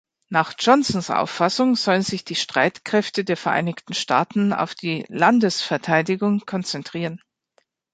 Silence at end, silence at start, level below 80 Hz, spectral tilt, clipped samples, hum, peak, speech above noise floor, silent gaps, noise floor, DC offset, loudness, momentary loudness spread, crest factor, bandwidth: 0.75 s; 0.3 s; -62 dBFS; -4.5 dB/octave; under 0.1%; none; -2 dBFS; 45 dB; none; -66 dBFS; under 0.1%; -21 LUFS; 9 LU; 20 dB; 9.4 kHz